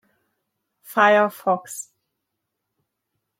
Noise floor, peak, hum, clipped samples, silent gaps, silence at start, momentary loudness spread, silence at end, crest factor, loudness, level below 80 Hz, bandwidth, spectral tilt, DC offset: -80 dBFS; -4 dBFS; none; under 0.1%; none; 0.9 s; 19 LU; 1.6 s; 20 dB; -19 LUFS; -82 dBFS; 16.5 kHz; -3.5 dB/octave; under 0.1%